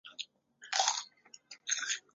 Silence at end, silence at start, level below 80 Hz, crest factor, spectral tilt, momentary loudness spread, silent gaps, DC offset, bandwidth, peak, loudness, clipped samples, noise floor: 0.15 s; 0.05 s; under -90 dBFS; 24 dB; 6 dB/octave; 18 LU; none; under 0.1%; 8 kHz; -14 dBFS; -34 LUFS; under 0.1%; -58 dBFS